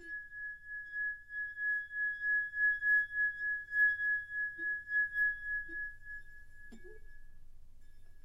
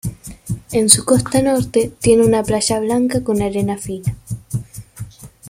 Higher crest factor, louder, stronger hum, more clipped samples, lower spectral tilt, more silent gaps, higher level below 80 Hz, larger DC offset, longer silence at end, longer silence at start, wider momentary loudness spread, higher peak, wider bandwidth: about the same, 16 dB vs 18 dB; second, -34 LUFS vs -16 LUFS; neither; neither; about the same, -3.5 dB/octave vs -4.5 dB/octave; neither; second, -58 dBFS vs -40 dBFS; neither; about the same, 0 s vs 0 s; about the same, 0 s vs 0.05 s; second, 15 LU vs 22 LU; second, -22 dBFS vs 0 dBFS; second, 12.5 kHz vs 16.5 kHz